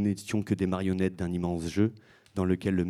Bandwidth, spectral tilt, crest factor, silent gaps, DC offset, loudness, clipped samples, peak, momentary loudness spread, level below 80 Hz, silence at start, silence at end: 13.5 kHz; -7 dB/octave; 16 dB; none; under 0.1%; -30 LUFS; under 0.1%; -12 dBFS; 4 LU; -54 dBFS; 0 s; 0 s